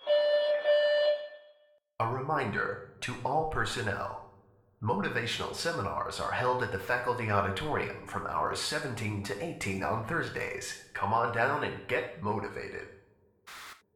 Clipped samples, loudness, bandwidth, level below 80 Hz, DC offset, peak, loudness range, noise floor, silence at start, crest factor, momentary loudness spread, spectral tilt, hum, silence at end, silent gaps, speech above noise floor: under 0.1%; -31 LUFS; 16 kHz; -56 dBFS; under 0.1%; -14 dBFS; 3 LU; -64 dBFS; 0 s; 18 dB; 12 LU; -4.5 dB/octave; none; 0.2 s; none; 32 dB